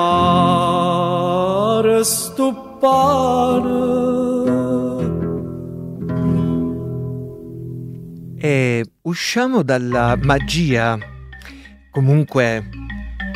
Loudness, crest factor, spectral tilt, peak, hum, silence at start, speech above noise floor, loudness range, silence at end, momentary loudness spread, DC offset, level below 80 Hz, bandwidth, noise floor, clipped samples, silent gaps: -18 LUFS; 18 dB; -5.5 dB/octave; 0 dBFS; none; 0 s; 23 dB; 6 LU; 0 s; 16 LU; under 0.1%; -38 dBFS; 15.5 kHz; -40 dBFS; under 0.1%; none